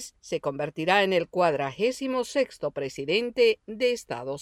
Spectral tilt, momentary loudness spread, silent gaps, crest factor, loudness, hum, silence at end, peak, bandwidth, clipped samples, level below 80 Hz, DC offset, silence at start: -4.5 dB/octave; 10 LU; none; 18 dB; -26 LUFS; none; 0 s; -8 dBFS; 14.5 kHz; under 0.1%; -64 dBFS; under 0.1%; 0 s